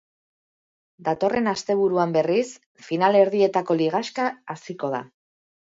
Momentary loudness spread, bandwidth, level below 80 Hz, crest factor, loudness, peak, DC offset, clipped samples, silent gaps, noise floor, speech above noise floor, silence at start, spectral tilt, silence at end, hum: 13 LU; 7.8 kHz; -68 dBFS; 18 dB; -23 LUFS; -4 dBFS; under 0.1%; under 0.1%; 2.66-2.75 s; under -90 dBFS; over 68 dB; 1 s; -5.5 dB/octave; 0.7 s; none